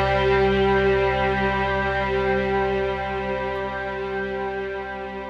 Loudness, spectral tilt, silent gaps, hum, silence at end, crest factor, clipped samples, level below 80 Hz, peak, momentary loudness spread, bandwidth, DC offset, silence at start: -23 LUFS; -7 dB/octave; none; none; 0 s; 14 dB; under 0.1%; -36 dBFS; -10 dBFS; 9 LU; 7 kHz; under 0.1%; 0 s